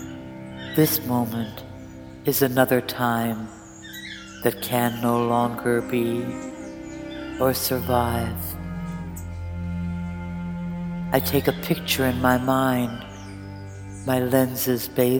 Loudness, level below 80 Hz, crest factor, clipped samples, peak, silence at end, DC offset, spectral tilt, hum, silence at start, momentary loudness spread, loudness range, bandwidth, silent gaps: -24 LUFS; -46 dBFS; 22 dB; under 0.1%; -2 dBFS; 0 s; under 0.1%; -5.5 dB/octave; none; 0 s; 17 LU; 4 LU; 19.5 kHz; none